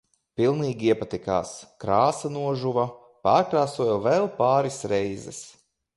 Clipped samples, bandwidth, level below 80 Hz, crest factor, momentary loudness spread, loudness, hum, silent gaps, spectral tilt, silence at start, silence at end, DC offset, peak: under 0.1%; 11.5 kHz; -58 dBFS; 18 dB; 12 LU; -24 LUFS; none; none; -6 dB/octave; 0.4 s; 0.45 s; under 0.1%; -6 dBFS